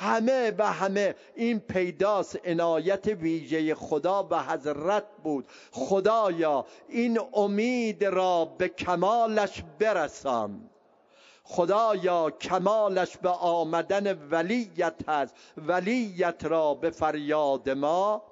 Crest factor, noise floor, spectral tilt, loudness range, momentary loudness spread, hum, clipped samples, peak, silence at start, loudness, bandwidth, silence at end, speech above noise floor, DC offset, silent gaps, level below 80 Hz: 18 dB; -61 dBFS; -5.5 dB/octave; 2 LU; 6 LU; none; under 0.1%; -10 dBFS; 0 s; -27 LUFS; 7.8 kHz; 0.05 s; 34 dB; under 0.1%; none; -66 dBFS